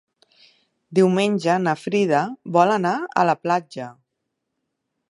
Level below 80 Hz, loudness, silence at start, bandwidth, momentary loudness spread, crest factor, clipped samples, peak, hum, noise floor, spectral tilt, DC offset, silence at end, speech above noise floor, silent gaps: -72 dBFS; -20 LUFS; 0.9 s; 11.5 kHz; 7 LU; 20 dB; under 0.1%; -2 dBFS; none; -78 dBFS; -6 dB/octave; under 0.1%; 1.15 s; 59 dB; none